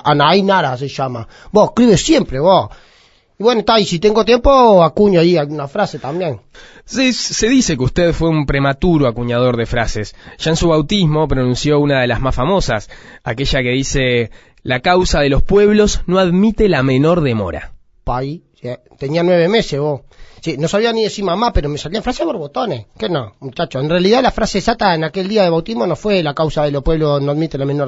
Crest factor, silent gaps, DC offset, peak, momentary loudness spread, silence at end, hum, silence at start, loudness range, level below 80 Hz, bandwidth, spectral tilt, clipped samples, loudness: 14 dB; none; under 0.1%; 0 dBFS; 12 LU; 0 s; none; 0.05 s; 5 LU; -28 dBFS; 8 kHz; -5.5 dB/octave; under 0.1%; -14 LUFS